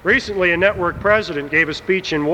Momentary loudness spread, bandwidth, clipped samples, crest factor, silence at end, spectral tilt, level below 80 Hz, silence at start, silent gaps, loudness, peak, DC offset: 4 LU; 11 kHz; under 0.1%; 16 dB; 0 s; -5 dB/octave; -42 dBFS; 0.05 s; none; -17 LUFS; -2 dBFS; under 0.1%